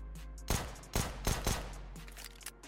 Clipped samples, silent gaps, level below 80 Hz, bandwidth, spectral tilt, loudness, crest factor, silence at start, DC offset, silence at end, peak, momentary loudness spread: under 0.1%; none; -42 dBFS; 17 kHz; -3.5 dB/octave; -39 LUFS; 16 dB; 0 s; under 0.1%; 0 s; -22 dBFS; 13 LU